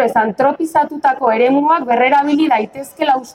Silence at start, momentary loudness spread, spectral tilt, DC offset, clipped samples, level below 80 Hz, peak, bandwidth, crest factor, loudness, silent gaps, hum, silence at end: 0 s; 5 LU; -5 dB/octave; under 0.1%; under 0.1%; -60 dBFS; 0 dBFS; 16 kHz; 14 dB; -14 LUFS; none; none; 0.05 s